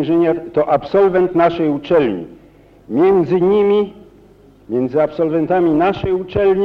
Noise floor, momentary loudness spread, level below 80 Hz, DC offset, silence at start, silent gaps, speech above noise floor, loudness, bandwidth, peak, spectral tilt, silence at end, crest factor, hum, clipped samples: -46 dBFS; 7 LU; -46 dBFS; under 0.1%; 0 s; none; 31 dB; -15 LUFS; 5.6 kHz; -2 dBFS; -9 dB/octave; 0 s; 14 dB; none; under 0.1%